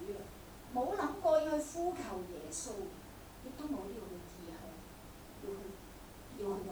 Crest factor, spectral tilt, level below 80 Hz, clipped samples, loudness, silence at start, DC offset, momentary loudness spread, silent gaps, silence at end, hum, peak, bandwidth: 20 dB; -4.5 dB/octave; -58 dBFS; under 0.1%; -40 LUFS; 0 s; under 0.1%; 20 LU; none; 0 s; none; -20 dBFS; over 20 kHz